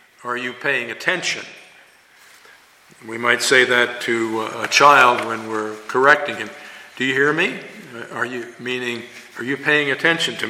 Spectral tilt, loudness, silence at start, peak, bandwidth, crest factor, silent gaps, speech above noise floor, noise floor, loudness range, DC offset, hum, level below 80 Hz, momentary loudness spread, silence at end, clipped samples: -2.5 dB/octave; -18 LUFS; 0.25 s; 0 dBFS; 16 kHz; 20 dB; none; 30 dB; -50 dBFS; 7 LU; under 0.1%; none; -68 dBFS; 18 LU; 0 s; under 0.1%